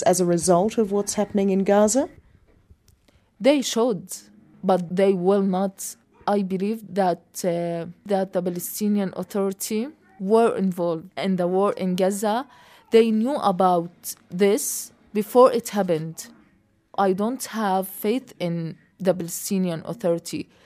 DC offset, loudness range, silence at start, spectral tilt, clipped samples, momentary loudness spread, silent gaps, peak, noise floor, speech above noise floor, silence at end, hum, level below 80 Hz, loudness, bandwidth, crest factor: under 0.1%; 4 LU; 0 s; -5.5 dB/octave; under 0.1%; 12 LU; none; -4 dBFS; -62 dBFS; 40 dB; 0.2 s; none; -64 dBFS; -23 LUFS; 15.5 kHz; 20 dB